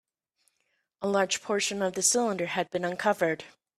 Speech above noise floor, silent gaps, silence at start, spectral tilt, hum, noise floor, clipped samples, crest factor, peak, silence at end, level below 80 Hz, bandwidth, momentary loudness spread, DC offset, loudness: 48 dB; none; 1 s; -2.5 dB/octave; none; -76 dBFS; under 0.1%; 20 dB; -10 dBFS; 0.3 s; -74 dBFS; 15.5 kHz; 7 LU; under 0.1%; -28 LUFS